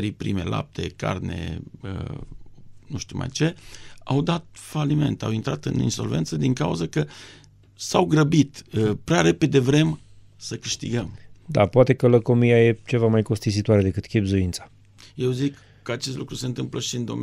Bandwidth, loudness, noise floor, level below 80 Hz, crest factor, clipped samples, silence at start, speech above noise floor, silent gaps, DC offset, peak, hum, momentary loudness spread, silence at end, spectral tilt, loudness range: 14.5 kHz; -23 LUFS; -42 dBFS; -48 dBFS; 20 dB; under 0.1%; 0 s; 20 dB; none; under 0.1%; -2 dBFS; none; 16 LU; 0 s; -6 dB/octave; 9 LU